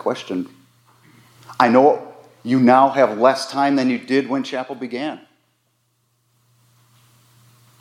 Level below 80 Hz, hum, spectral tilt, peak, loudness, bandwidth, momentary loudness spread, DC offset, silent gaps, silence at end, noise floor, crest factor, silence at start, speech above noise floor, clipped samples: -78 dBFS; none; -5.5 dB/octave; 0 dBFS; -18 LUFS; 12.5 kHz; 16 LU; under 0.1%; none; 2.65 s; -66 dBFS; 20 dB; 0.05 s; 49 dB; under 0.1%